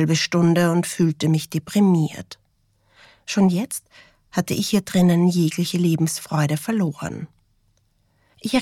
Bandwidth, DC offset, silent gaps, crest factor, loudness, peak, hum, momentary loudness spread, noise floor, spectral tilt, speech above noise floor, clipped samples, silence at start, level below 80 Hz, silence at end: 15.5 kHz; under 0.1%; none; 12 dB; -21 LUFS; -8 dBFS; none; 14 LU; -64 dBFS; -5.5 dB/octave; 44 dB; under 0.1%; 0 s; -58 dBFS; 0 s